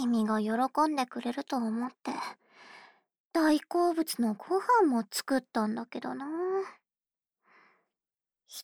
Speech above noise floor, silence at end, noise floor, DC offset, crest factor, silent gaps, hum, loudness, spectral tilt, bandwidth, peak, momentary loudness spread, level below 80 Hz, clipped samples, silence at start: over 60 dB; 0 s; under -90 dBFS; under 0.1%; 16 dB; 3.20-3.31 s; none; -30 LUFS; -4.5 dB/octave; over 20 kHz; -14 dBFS; 11 LU; -80 dBFS; under 0.1%; 0 s